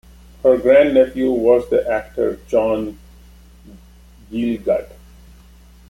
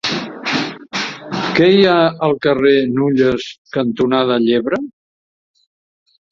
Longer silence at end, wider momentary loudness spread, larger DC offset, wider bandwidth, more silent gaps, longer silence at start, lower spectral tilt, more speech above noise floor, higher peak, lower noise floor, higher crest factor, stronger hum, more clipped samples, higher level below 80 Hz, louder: second, 1.05 s vs 1.4 s; about the same, 11 LU vs 11 LU; neither; first, 16 kHz vs 7.6 kHz; second, none vs 3.58-3.65 s; first, 0.45 s vs 0.05 s; about the same, -7 dB/octave vs -6 dB/octave; second, 29 dB vs over 76 dB; about the same, -2 dBFS vs 0 dBFS; second, -45 dBFS vs under -90 dBFS; about the same, 16 dB vs 16 dB; neither; neither; first, -44 dBFS vs -52 dBFS; about the same, -17 LUFS vs -15 LUFS